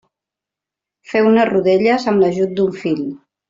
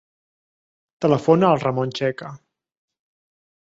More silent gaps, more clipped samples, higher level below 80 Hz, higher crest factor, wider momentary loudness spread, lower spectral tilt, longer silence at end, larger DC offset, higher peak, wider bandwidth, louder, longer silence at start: neither; neither; about the same, -58 dBFS vs -62 dBFS; second, 14 dB vs 20 dB; second, 8 LU vs 14 LU; about the same, -7 dB/octave vs -7.5 dB/octave; second, 0.35 s vs 1.25 s; neither; about the same, -4 dBFS vs -4 dBFS; about the same, 7.6 kHz vs 7.8 kHz; first, -16 LUFS vs -20 LUFS; about the same, 1.1 s vs 1 s